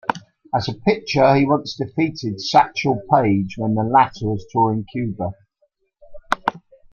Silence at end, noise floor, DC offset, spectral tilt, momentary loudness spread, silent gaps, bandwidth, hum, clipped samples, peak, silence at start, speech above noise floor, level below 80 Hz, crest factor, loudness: 0.35 s; -66 dBFS; under 0.1%; -6.5 dB/octave; 10 LU; none; 8.4 kHz; none; under 0.1%; 0 dBFS; 0.1 s; 48 dB; -50 dBFS; 20 dB; -19 LUFS